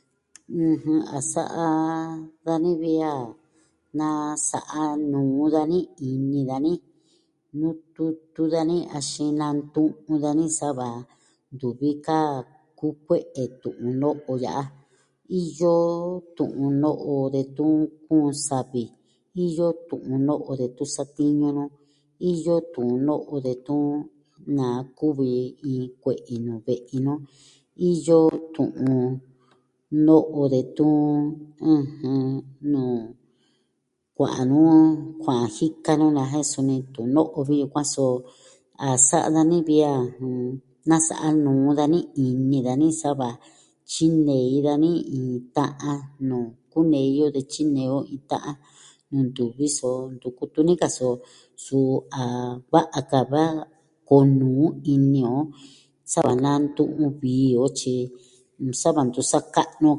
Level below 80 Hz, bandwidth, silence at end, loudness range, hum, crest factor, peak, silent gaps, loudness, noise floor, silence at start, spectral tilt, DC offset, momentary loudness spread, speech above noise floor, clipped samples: -64 dBFS; 11.5 kHz; 0 s; 6 LU; none; 22 dB; -2 dBFS; none; -23 LUFS; -75 dBFS; 0.5 s; -6 dB/octave; under 0.1%; 11 LU; 53 dB; under 0.1%